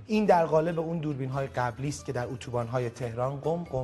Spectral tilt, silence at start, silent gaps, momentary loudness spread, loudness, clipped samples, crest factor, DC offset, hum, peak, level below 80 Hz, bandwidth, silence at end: -7 dB/octave; 0 s; none; 11 LU; -29 LUFS; under 0.1%; 18 dB; under 0.1%; none; -10 dBFS; -56 dBFS; 12 kHz; 0 s